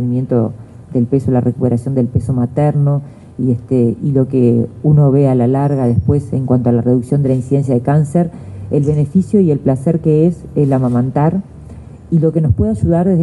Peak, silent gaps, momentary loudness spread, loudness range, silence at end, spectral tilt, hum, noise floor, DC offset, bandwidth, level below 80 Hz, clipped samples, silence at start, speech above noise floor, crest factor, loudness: 0 dBFS; none; 6 LU; 2 LU; 0 s; -10.5 dB/octave; none; -33 dBFS; under 0.1%; 11 kHz; -38 dBFS; under 0.1%; 0 s; 20 dB; 12 dB; -14 LUFS